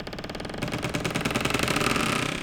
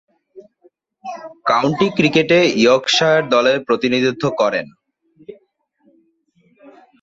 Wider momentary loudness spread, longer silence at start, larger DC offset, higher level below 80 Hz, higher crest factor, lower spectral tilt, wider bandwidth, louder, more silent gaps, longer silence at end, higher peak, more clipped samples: second, 11 LU vs 19 LU; second, 0 s vs 0.35 s; neither; first, -44 dBFS vs -58 dBFS; about the same, 20 dB vs 16 dB; about the same, -4 dB/octave vs -4.5 dB/octave; first, over 20 kHz vs 8 kHz; second, -27 LUFS vs -15 LUFS; neither; second, 0 s vs 1.7 s; second, -8 dBFS vs -2 dBFS; neither